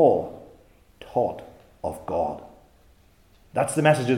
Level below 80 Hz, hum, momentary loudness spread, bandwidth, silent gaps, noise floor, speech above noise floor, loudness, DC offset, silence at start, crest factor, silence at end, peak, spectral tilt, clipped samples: -58 dBFS; none; 20 LU; 16.5 kHz; none; -57 dBFS; 35 dB; -26 LUFS; under 0.1%; 0 s; 20 dB; 0 s; -4 dBFS; -6 dB/octave; under 0.1%